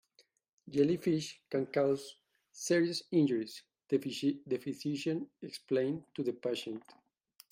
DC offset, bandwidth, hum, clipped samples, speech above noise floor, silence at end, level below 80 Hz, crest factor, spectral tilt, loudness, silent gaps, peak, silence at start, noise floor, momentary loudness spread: under 0.1%; 16 kHz; none; under 0.1%; 37 dB; 0.75 s; -78 dBFS; 18 dB; -5.5 dB/octave; -34 LUFS; none; -16 dBFS; 0.65 s; -71 dBFS; 14 LU